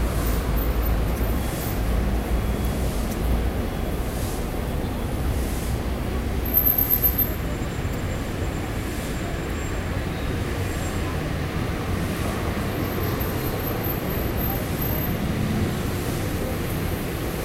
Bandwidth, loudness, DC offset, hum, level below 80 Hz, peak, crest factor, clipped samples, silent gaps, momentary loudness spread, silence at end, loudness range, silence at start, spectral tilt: 16 kHz; -25 LUFS; under 0.1%; none; -28 dBFS; -8 dBFS; 18 dB; under 0.1%; none; 6 LU; 0 s; 5 LU; 0 s; -6 dB/octave